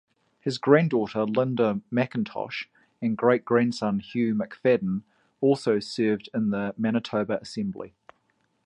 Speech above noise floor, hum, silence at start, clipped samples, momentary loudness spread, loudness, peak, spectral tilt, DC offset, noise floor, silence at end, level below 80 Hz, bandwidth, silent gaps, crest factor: 46 dB; none; 0.45 s; under 0.1%; 11 LU; -26 LUFS; -4 dBFS; -7 dB/octave; under 0.1%; -70 dBFS; 0.75 s; -66 dBFS; 10.5 kHz; none; 22 dB